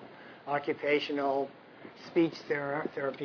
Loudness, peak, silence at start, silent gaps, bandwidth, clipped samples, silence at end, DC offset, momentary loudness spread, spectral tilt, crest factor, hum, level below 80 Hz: -32 LUFS; -16 dBFS; 0 s; none; 5.4 kHz; under 0.1%; 0 s; under 0.1%; 19 LU; -6.5 dB/octave; 16 dB; none; -78 dBFS